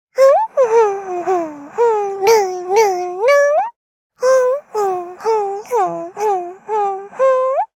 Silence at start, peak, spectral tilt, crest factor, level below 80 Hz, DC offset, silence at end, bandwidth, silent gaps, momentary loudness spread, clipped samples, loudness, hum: 0.15 s; 0 dBFS; -3 dB/octave; 16 dB; -72 dBFS; under 0.1%; 0.1 s; 16.5 kHz; 3.76-4.10 s; 9 LU; under 0.1%; -16 LUFS; none